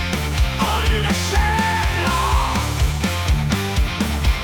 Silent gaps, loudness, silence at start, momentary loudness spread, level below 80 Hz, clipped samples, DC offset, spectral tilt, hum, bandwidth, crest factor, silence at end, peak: none; -19 LUFS; 0 s; 3 LU; -22 dBFS; under 0.1%; under 0.1%; -4.5 dB/octave; none; 19.5 kHz; 12 dB; 0 s; -6 dBFS